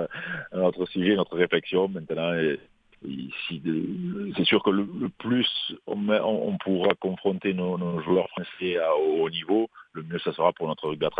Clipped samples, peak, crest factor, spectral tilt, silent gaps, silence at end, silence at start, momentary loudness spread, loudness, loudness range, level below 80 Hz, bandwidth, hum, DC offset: under 0.1%; -4 dBFS; 22 dB; -8.5 dB/octave; none; 0 s; 0 s; 9 LU; -26 LUFS; 2 LU; -64 dBFS; 5 kHz; none; under 0.1%